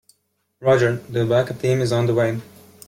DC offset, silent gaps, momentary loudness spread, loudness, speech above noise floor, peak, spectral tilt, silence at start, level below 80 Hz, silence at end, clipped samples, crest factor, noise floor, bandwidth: under 0.1%; none; 6 LU; -20 LUFS; 47 dB; -4 dBFS; -6.5 dB/octave; 0.6 s; -56 dBFS; 0.45 s; under 0.1%; 16 dB; -66 dBFS; 16.5 kHz